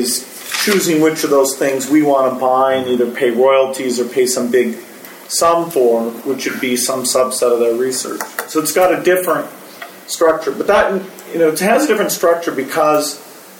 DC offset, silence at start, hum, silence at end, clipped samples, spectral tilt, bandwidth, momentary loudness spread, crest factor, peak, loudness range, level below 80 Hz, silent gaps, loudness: under 0.1%; 0 s; none; 0 s; under 0.1%; -3 dB/octave; 17 kHz; 9 LU; 14 dB; 0 dBFS; 2 LU; -56 dBFS; none; -15 LUFS